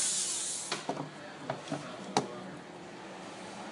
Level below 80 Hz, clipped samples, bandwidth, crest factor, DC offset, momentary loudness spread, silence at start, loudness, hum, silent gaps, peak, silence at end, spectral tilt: -76 dBFS; under 0.1%; 16 kHz; 26 dB; under 0.1%; 14 LU; 0 s; -37 LUFS; none; none; -12 dBFS; 0 s; -2 dB/octave